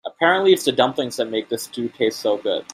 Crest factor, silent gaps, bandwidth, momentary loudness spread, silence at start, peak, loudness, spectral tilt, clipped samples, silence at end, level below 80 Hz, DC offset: 18 dB; none; 16 kHz; 10 LU; 0.05 s; -2 dBFS; -20 LUFS; -3.5 dB/octave; under 0.1%; 0.1 s; -66 dBFS; under 0.1%